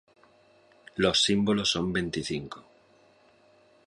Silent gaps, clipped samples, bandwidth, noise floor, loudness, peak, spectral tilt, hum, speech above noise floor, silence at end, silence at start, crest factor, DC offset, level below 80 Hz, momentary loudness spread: none; under 0.1%; 11.5 kHz; -61 dBFS; -26 LUFS; -8 dBFS; -4 dB/octave; none; 34 dB; 1.25 s; 0.95 s; 22 dB; under 0.1%; -56 dBFS; 18 LU